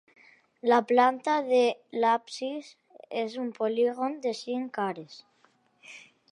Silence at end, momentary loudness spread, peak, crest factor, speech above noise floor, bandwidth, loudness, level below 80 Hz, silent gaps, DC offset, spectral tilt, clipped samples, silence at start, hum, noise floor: 0.3 s; 19 LU; -8 dBFS; 20 dB; 39 dB; 10.5 kHz; -28 LUFS; -88 dBFS; none; under 0.1%; -4.5 dB/octave; under 0.1%; 0.65 s; none; -66 dBFS